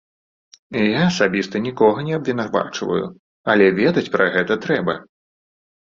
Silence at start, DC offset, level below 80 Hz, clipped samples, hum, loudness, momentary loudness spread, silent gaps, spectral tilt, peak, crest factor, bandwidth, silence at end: 0.7 s; under 0.1%; -58 dBFS; under 0.1%; none; -19 LUFS; 10 LU; 3.19-3.44 s; -6 dB/octave; -2 dBFS; 18 dB; 7.6 kHz; 0.95 s